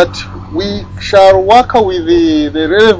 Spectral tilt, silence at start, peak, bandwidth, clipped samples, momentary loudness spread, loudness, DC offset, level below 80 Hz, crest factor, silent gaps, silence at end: -5.5 dB/octave; 0 s; 0 dBFS; 8 kHz; 4%; 13 LU; -9 LUFS; under 0.1%; -32 dBFS; 10 dB; none; 0 s